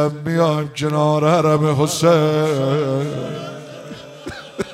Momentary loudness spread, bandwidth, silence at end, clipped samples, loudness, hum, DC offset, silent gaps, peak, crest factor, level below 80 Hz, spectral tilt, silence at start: 19 LU; 15 kHz; 0 s; under 0.1%; -17 LUFS; none; under 0.1%; none; -2 dBFS; 16 dB; -56 dBFS; -6 dB/octave; 0 s